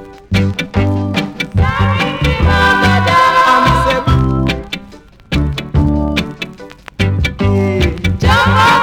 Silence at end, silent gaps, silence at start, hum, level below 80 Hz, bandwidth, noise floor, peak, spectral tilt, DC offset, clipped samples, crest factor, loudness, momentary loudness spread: 0 s; none; 0 s; none; -22 dBFS; 16 kHz; -37 dBFS; -2 dBFS; -6 dB/octave; under 0.1%; under 0.1%; 10 dB; -13 LUFS; 11 LU